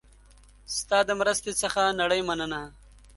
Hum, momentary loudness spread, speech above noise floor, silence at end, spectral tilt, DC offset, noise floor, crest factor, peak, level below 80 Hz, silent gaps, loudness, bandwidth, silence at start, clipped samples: none; 10 LU; 28 dB; 0.4 s; -2 dB/octave; under 0.1%; -54 dBFS; 20 dB; -8 dBFS; -52 dBFS; none; -26 LUFS; 12 kHz; 0.7 s; under 0.1%